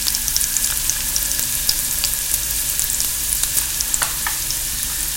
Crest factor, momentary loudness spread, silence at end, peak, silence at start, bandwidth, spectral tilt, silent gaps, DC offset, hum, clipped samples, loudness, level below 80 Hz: 20 dB; 3 LU; 0 s; 0 dBFS; 0 s; over 20 kHz; 0.5 dB/octave; none; under 0.1%; none; under 0.1%; -18 LUFS; -34 dBFS